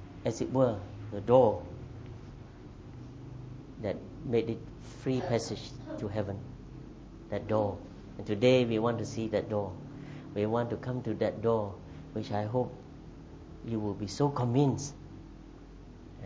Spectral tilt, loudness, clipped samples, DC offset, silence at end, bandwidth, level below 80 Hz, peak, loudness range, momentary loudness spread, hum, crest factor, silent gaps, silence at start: -7 dB/octave; -32 LUFS; under 0.1%; under 0.1%; 0 s; 8 kHz; -54 dBFS; -10 dBFS; 5 LU; 21 LU; none; 22 dB; none; 0 s